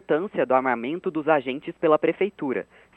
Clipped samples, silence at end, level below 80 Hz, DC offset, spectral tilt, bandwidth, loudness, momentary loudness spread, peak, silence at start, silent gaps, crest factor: under 0.1%; 0.35 s; -68 dBFS; under 0.1%; -8.5 dB/octave; 4.1 kHz; -24 LUFS; 8 LU; -6 dBFS; 0.1 s; none; 18 dB